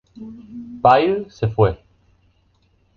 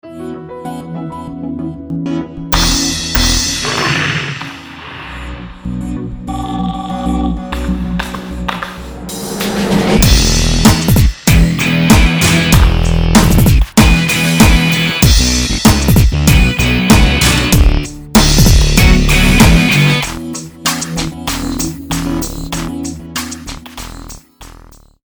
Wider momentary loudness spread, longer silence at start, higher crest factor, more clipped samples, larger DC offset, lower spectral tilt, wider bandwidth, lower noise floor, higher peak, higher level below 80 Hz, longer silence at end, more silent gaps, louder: first, 23 LU vs 16 LU; first, 0.2 s vs 0.05 s; first, 20 dB vs 12 dB; second, under 0.1% vs 0.4%; neither; first, -8 dB/octave vs -4.5 dB/octave; second, 6.6 kHz vs over 20 kHz; first, -60 dBFS vs -39 dBFS; about the same, -2 dBFS vs 0 dBFS; second, -44 dBFS vs -16 dBFS; first, 1.2 s vs 0.55 s; neither; second, -18 LUFS vs -12 LUFS